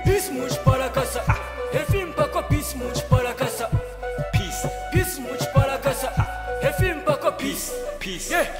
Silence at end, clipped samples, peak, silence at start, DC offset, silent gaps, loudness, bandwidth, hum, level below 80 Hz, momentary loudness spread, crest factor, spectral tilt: 0 s; under 0.1%; -6 dBFS; 0 s; under 0.1%; none; -24 LUFS; 16 kHz; none; -34 dBFS; 7 LU; 18 dB; -5 dB/octave